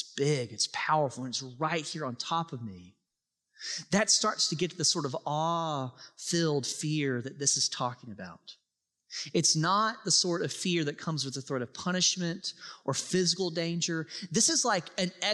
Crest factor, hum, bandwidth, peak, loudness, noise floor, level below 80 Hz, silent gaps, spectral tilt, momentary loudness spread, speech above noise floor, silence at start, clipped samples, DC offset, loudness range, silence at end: 18 dB; none; 13 kHz; -12 dBFS; -29 LUFS; -86 dBFS; -76 dBFS; none; -3 dB/octave; 13 LU; 55 dB; 0 s; under 0.1%; under 0.1%; 3 LU; 0 s